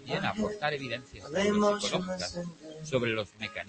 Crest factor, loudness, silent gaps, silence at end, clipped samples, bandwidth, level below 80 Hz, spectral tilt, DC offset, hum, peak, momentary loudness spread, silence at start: 18 dB; -31 LUFS; none; 0 s; under 0.1%; 8.8 kHz; -60 dBFS; -4.5 dB/octave; under 0.1%; none; -14 dBFS; 12 LU; 0 s